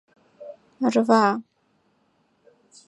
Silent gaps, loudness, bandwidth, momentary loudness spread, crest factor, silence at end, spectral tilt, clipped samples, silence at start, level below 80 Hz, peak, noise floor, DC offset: none; -21 LUFS; 10.5 kHz; 25 LU; 22 dB; 1.45 s; -5.5 dB/octave; under 0.1%; 0.4 s; -78 dBFS; -4 dBFS; -67 dBFS; under 0.1%